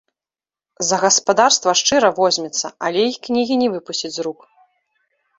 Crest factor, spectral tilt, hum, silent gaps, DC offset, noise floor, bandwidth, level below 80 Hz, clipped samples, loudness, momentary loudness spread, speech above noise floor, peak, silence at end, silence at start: 18 dB; -2 dB/octave; none; none; under 0.1%; under -90 dBFS; 8.2 kHz; -62 dBFS; under 0.1%; -17 LUFS; 11 LU; over 73 dB; 0 dBFS; 1.05 s; 0.8 s